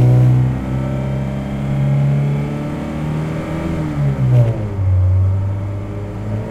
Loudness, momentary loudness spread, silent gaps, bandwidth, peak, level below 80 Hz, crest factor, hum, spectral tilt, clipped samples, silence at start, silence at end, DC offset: -18 LUFS; 9 LU; none; 8 kHz; -2 dBFS; -32 dBFS; 14 dB; none; -9 dB/octave; under 0.1%; 0 s; 0 s; under 0.1%